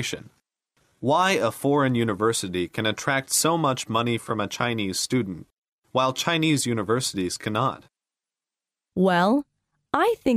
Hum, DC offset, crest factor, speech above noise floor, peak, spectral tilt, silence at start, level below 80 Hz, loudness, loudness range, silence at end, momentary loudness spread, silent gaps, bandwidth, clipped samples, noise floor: none; under 0.1%; 20 dB; 66 dB; -6 dBFS; -4 dB/octave; 0 s; -60 dBFS; -24 LUFS; 3 LU; 0 s; 8 LU; 5.53-5.62 s, 5.68-5.82 s; 15.5 kHz; under 0.1%; -90 dBFS